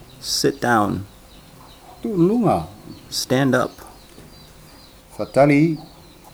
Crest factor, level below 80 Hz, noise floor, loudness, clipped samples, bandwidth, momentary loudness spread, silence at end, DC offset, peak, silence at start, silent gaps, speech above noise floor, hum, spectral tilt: 18 dB; -50 dBFS; -45 dBFS; -19 LUFS; under 0.1%; over 20 kHz; 20 LU; 0.5 s; under 0.1%; -4 dBFS; 0.2 s; none; 27 dB; none; -5 dB/octave